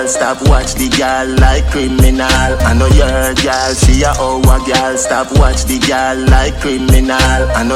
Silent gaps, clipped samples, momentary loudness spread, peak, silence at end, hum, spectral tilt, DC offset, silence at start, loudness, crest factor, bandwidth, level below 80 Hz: none; 0.4%; 3 LU; 0 dBFS; 0 s; none; -4.5 dB/octave; under 0.1%; 0 s; -11 LUFS; 10 dB; 15.5 kHz; -14 dBFS